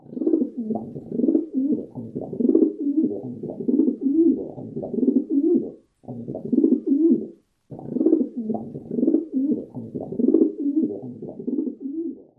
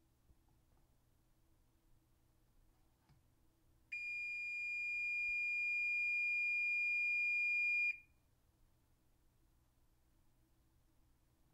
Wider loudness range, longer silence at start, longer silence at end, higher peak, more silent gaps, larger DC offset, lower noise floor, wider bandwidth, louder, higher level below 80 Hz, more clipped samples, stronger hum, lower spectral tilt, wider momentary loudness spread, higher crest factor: second, 2 LU vs 13 LU; second, 0.1 s vs 3.9 s; second, 0.15 s vs 3.5 s; first, -4 dBFS vs -32 dBFS; neither; neither; second, -43 dBFS vs -75 dBFS; second, 1.3 kHz vs 10.5 kHz; first, -23 LUFS vs -36 LUFS; first, -64 dBFS vs -76 dBFS; neither; neither; first, -13 dB/octave vs -0.5 dB/octave; first, 14 LU vs 8 LU; first, 20 dB vs 10 dB